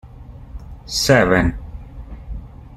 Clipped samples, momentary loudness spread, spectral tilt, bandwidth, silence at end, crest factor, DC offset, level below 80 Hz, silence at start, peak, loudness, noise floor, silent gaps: under 0.1%; 24 LU; -4.5 dB/octave; 15.5 kHz; 0 s; 20 dB; under 0.1%; -32 dBFS; 0.05 s; -2 dBFS; -16 LUFS; -38 dBFS; none